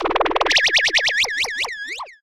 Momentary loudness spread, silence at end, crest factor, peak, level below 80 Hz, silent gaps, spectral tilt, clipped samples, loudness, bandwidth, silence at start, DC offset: 11 LU; 0.1 s; 16 dB; -4 dBFS; -46 dBFS; none; 0 dB/octave; under 0.1%; -17 LUFS; 17 kHz; 0 s; under 0.1%